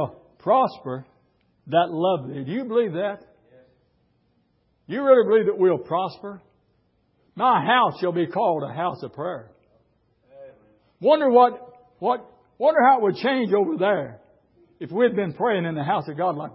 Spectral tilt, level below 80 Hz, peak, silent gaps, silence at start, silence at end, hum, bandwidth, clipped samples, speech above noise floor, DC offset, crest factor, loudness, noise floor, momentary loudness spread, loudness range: -10.5 dB/octave; -68 dBFS; -4 dBFS; none; 0 s; 0.05 s; none; 5.8 kHz; under 0.1%; 45 dB; under 0.1%; 20 dB; -22 LUFS; -66 dBFS; 15 LU; 6 LU